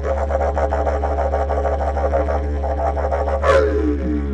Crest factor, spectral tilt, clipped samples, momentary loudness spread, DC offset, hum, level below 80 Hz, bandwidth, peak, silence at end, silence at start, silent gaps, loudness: 16 dB; -8 dB/octave; under 0.1%; 5 LU; under 0.1%; none; -24 dBFS; 8 kHz; -2 dBFS; 0 s; 0 s; none; -19 LUFS